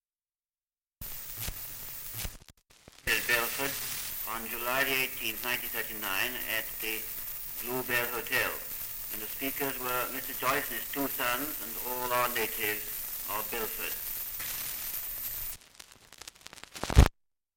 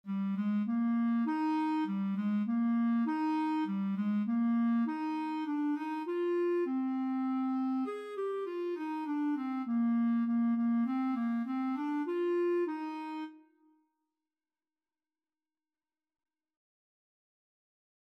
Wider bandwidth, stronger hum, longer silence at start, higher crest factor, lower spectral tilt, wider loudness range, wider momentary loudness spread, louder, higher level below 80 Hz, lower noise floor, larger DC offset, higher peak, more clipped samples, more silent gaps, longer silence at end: first, 17 kHz vs 5.6 kHz; neither; first, 1 s vs 0.05 s; first, 28 dB vs 10 dB; second, -3 dB/octave vs -8.5 dB/octave; about the same, 4 LU vs 5 LU; first, 11 LU vs 6 LU; about the same, -31 LUFS vs -33 LUFS; first, -40 dBFS vs under -90 dBFS; about the same, under -90 dBFS vs under -90 dBFS; neither; first, -6 dBFS vs -24 dBFS; neither; neither; second, 0.45 s vs 4.7 s